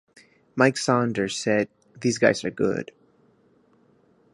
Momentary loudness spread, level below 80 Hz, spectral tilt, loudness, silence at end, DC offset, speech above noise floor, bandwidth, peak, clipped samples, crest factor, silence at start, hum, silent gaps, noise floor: 11 LU; -64 dBFS; -5 dB/octave; -24 LUFS; 1.5 s; under 0.1%; 38 dB; 11.5 kHz; -2 dBFS; under 0.1%; 24 dB; 0.55 s; none; none; -61 dBFS